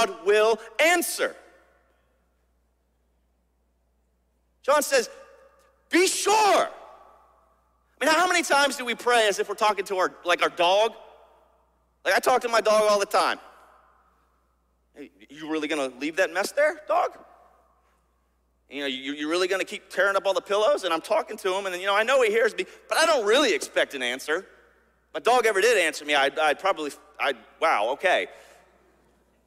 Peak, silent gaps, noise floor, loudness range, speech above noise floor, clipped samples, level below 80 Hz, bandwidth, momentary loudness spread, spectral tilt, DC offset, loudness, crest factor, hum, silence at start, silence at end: -6 dBFS; none; -69 dBFS; 7 LU; 45 dB; under 0.1%; -68 dBFS; 16 kHz; 10 LU; -1 dB/octave; under 0.1%; -23 LUFS; 18 dB; none; 0 s; 1.1 s